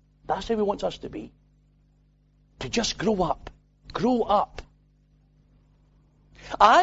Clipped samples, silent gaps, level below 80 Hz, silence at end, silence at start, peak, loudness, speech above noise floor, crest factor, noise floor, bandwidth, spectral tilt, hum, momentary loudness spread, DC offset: under 0.1%; none; -50 dBFS; 0 s; 0.3 s; -4 dBFS; -26 LUFS; 38 dB; 24 dB; -62 dBFS; 8 kHz; -4 dB/octave; 50 Hz at -55 dBFS; 20 LU; under 0.1%